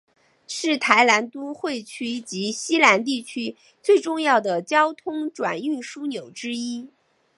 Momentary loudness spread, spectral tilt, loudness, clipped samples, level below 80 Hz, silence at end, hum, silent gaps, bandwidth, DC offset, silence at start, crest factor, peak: 15 LU; -3 dB/octave; -22 LUFS; under 0.1%; -76 dBFS; 0.5 s; none; none; 11.5 kHz; under 0.1%; 0.5 s; 22 dB; 0 dBFS